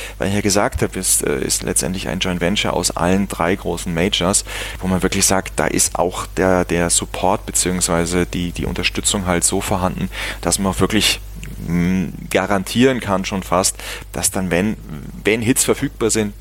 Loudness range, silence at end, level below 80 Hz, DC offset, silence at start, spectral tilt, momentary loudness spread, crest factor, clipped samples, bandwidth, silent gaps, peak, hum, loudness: 2 LU; 0 s; -34 dBFS; under 0.1%; 0 s; -3.5 dB/octave; 7 LU; 16 dB; under 0.1%; 17 kHz; none; -2 dBFS; none; -18 LUFS